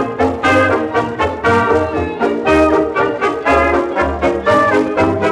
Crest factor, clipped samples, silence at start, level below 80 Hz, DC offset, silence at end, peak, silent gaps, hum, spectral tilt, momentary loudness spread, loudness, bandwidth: 14 dB; under 0.1%; 0 s; -36 dBFS; under 0.1%; 0 s; 0 dBFS; none; none; -6 dB/octave; 5 LU; -14 LUFS; 12 kHz